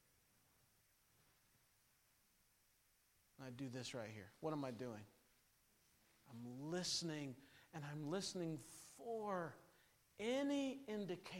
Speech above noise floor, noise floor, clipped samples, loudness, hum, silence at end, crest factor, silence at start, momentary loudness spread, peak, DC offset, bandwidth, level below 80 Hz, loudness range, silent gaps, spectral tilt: 31 dB; -78 dBFS; under 0.1%; -47 LUFS; none; 0 s; 20 dB; 3.4 s; 16 LU; -30 dBFS; under 0.1%; 16.5 kHz; -84 dBFS; 10 LU; none; -4.5 dB/octave